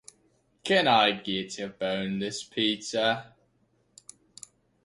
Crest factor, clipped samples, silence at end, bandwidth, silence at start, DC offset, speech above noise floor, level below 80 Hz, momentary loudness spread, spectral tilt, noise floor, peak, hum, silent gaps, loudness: 22 dB; under 0.1%; 1.6 s; 11.5 kHz; 0.65 s; under 0.1%; 42 dB; -68 dBFS; 18 LU; -3.5 dB/octave; -69 dBFS; -8 dBFS; none; none; -27 LUFS